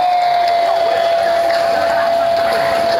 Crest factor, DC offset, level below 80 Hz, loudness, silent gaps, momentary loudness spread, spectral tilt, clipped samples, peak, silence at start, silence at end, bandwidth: 10 dB; under 0.1%; -50 dBFS; -14 LUFS; none; 1 LU; -3 dB/octave; under 0.1%; -4 dBFS; 0 s; 0 s; 15.5 kHz